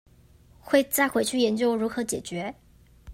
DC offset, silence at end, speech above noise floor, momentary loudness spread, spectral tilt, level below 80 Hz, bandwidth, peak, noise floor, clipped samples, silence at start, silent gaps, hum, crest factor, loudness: under 0.1%; 0 s; 30 dB; 11 LU; -3.5 dB/octave; -58 dBFS; 16 kHz; -6 dBFS; -55 dBFS; under 0.1%; 0.65 s; none; 60 Hz at -50 dBFS; 20 dB; -25 LUFS